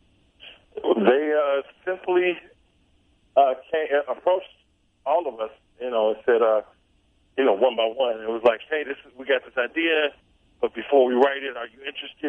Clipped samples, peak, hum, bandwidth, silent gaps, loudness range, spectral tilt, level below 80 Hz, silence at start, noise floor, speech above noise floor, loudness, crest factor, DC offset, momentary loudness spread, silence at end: under 0.1%; -4 dBFS; none; 3.9 kHz; none; 2 LU; -6.5 dB/octave; -66 dBFS; 0.45 s; -63 dBFS; 40 dB; -23 LUFS; 20 dB; under 0.1%; 14 LU; 0 s